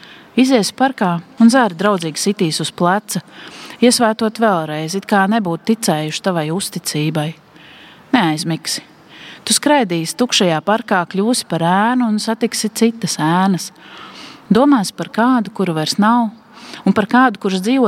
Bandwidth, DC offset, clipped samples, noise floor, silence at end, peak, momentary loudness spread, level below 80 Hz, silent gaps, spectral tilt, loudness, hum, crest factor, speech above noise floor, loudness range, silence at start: 16 kHz; under 0.1%; under 0.1%; -41 dBFS; 0 s; 0 dBFS; 10 LU; -64 dBFS; none; -4.5 dB/octave; -16 LUFS; none; 16 dB; 26 dB; 3 LU; 0.1 s